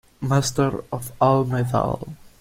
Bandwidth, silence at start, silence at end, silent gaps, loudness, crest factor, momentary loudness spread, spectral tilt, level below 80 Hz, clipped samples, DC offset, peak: 16 kHz; 0.2 s; 0.1 s; none; -22 LUFS; 18 dB; 12 LU; -6 dB/octave; -46 dBFS; under 0.1%; under 0.1%; -4 dBFS